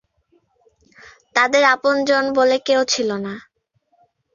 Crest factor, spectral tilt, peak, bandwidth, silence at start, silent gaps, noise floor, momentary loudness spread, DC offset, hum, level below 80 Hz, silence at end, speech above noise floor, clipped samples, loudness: 18 dB; -2.5 dB/octave; -2 dBFS; 7.6 kHz; 1.35 s; none; -65 dBFS; 12 LU; under 0.1%; none; -64 dBFS; 0.95 s; 48 dB; under 0.1%; -17 LUFS